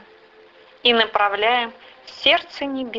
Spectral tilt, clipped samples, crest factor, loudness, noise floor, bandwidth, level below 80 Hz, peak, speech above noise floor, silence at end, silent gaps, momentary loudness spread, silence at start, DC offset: -3.5 dB/octave; under 0.1%; 20 dB; -19 LUFS; -49 dBFS; 7.6 kHz; -60 dBFS; -2 dBFS; 29 dB; 0 s; none; 11 LU; 0.85 s; under 0.1%